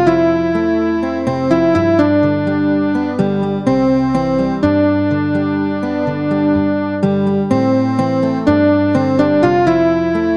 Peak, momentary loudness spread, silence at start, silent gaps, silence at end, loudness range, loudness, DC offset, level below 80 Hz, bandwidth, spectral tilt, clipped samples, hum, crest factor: -2 dBFS; 5 LU; 0 s; none; 0 s; 2 LU; -15 LUFS; 0.6%; -44 dBFS; 7.8 kHz; -8.5 dB/octave; under 0.1%; none; 12 dB